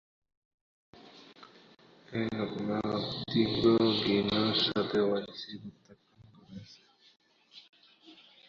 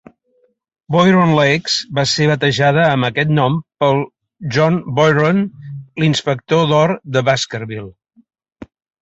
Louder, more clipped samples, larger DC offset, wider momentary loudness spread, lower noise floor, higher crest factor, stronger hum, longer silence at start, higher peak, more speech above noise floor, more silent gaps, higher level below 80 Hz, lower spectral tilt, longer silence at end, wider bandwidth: second, -30 LUFS vs -15 LUFS; neither; neither; first, 24 LU vs 12 LU; about the same, -59 dBFS vs -60 dBFS; first, 20 dB vs 14 dB; neither; first, 1.05 s vs 0.9 s; second, -12 dBFS vs -2 dBFS; second, 29 dB vs 46 dB; first, 7.69-7.73 s vs none; second, -64 dBFS vs -52 dBFS; about the same, -6.5 dB/octave vs -5.5 dB/octave; second, 0.35 s vs 1.1 s; second, 7.4 kHz vs 8.2 kHz